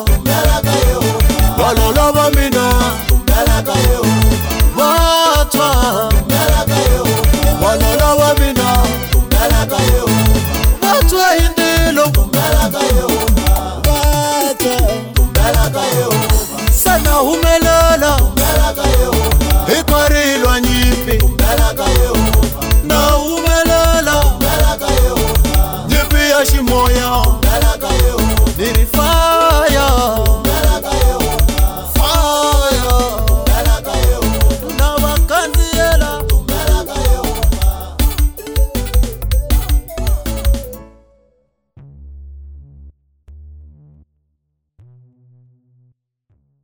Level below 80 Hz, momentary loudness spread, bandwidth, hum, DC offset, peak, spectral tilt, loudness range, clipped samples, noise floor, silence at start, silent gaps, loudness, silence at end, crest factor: -16 dBFS; 5 LU; over 20 kHz; none; under 0.1%; 0 dBFS; -4.5 dB/octave; 5 LU; under 0.1%; -69 dBFS; 0 s; none; -13 LUFS; 3 s; 12 dB